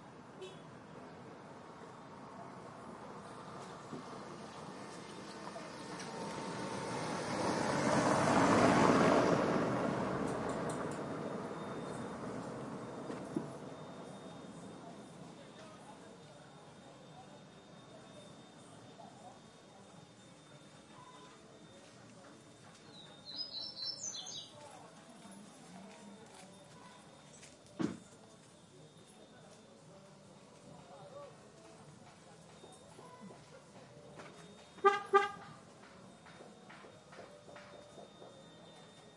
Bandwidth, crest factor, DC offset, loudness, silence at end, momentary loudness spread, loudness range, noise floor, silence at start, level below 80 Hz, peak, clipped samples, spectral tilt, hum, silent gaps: 11.5 kHz; 26 dB; under 0.1%; -37 LUFS; 0 s; 25 LU; 24 LU; -60 dBFS; 0 s; -72 dBFS; -14 dBFS; under 0.1%; -5 dB/octave; none; none